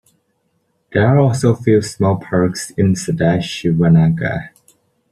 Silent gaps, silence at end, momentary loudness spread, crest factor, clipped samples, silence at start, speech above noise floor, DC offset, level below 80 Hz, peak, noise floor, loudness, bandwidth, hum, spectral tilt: none; 0.65 s; 7 LU; 14 dB; under 0.1%; 0.9 s; 51 dB; under 0.1%; -46 dBFS; -2 dBFS; -65 dBFS; -15 LUFS; 12.5 kHz; none; -7 dB/octave